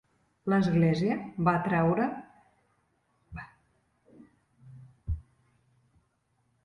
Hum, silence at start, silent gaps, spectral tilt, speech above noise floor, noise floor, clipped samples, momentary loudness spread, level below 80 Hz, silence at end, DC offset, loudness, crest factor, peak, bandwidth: none; 0.45 s; none; -8.5 dB/octave; 47 dB; -73 dBFS; under 0.1%; 20 LU; -50 dBFS; 1.45 s; under 0.1%; -28 LUFS; 20 dB; -12 dBFS; 7 kHz